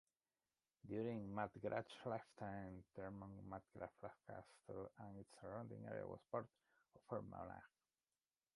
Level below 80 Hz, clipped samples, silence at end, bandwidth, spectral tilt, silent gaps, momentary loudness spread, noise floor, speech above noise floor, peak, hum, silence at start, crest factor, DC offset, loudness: -76 dBFS; under 0.1%; 0.9 s; 11 kHz; -7.5 dB/octave; none; 11 LU; under -90 dBFS; over 38 dB; -30 dBFS; none; 0.85 s; 22 dB; under 0.1%; -52 LUFS